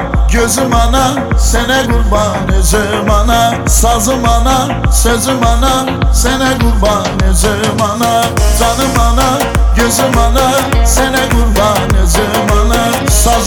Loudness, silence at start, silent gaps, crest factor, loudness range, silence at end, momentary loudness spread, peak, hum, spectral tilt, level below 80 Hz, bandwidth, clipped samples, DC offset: -11 LUFS; 0 s; none; 10 dB; 1 LU; 0 s; 2 LU; 0 dBFS; none; -4 dB/octave; -14 dBFS; 19 kHz; under 0.1%; under 0.1%